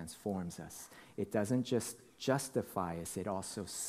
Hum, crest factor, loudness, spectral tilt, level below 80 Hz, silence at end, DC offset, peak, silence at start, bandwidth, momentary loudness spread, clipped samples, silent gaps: none; 22 dB; -38 LUFS; -5 dB/octave; -68 dBFS; 0 s; under 0.1%; -18 dBFS; 0 s; 15.5 kHz; 12 LU; under 0.1%; none